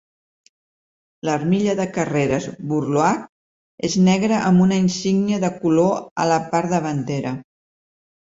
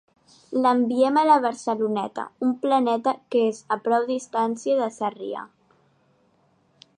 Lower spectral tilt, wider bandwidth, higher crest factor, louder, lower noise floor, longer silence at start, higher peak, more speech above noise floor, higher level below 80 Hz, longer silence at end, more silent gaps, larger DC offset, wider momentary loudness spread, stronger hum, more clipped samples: about the same, -6 dB/octave vs -5 dB/octave; second, 7.8 kHz vs 10 kHz; about the same, 16 dB vs 18 dB; first, -20 LUFS vs -23 LUFS; first, under -90 dBFS vs -64 dBFS; first, 1.25 s vs 0.5 s; about the same, -4 dBFS vs -6 dBFS; first, over 71 dB vs 41 dB; first, -56 dBFS vs -78 dBFS; second, 0.95 s vs 1.5 s; first, 3.29-3.78 s, 6.11-6.16 s vs none; neither; about the same, 9 LU vs 10 LU; neither; neither